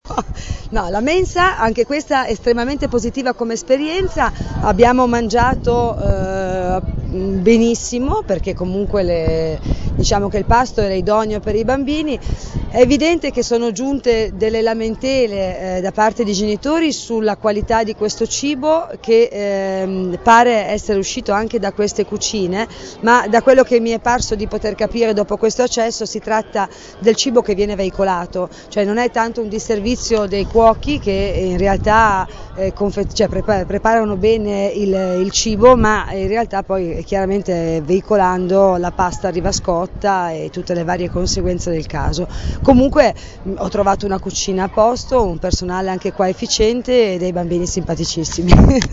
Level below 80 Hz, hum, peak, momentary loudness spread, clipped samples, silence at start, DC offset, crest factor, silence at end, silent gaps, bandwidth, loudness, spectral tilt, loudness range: -28 dBFS; none; 0 dBFS; 9 LU; under 0.1%; 0.05 s; under 0.1%; 16 dB; 0 s; none; 8 kHz; -16 LUFS; -5 dB/octave; 2 LU